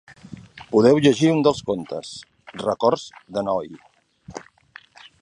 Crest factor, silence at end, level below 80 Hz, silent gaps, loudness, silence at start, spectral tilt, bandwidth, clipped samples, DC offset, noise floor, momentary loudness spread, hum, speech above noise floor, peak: 20 dB; 0.8 s; -58 dBFS; none; -20 LUFS; 0.3 s; -6 dB/octave; 10.5 kHz; under 0.1%; under 0.1%; -49 dBFS; 24 LU; none; 29 dB; -2 dBFS